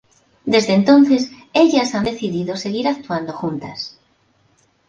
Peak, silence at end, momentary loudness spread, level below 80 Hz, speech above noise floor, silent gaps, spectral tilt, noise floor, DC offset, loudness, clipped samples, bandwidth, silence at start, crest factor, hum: -2 dBFS; 1 s; 15 LU; -54 dBFS; 43 dB; none; -5.5 dB/octave; -59 dBFS; under 0.1%; -17 LUFS; under 0.1%; 7.8 kHz; 0.45 s; 16 dB; none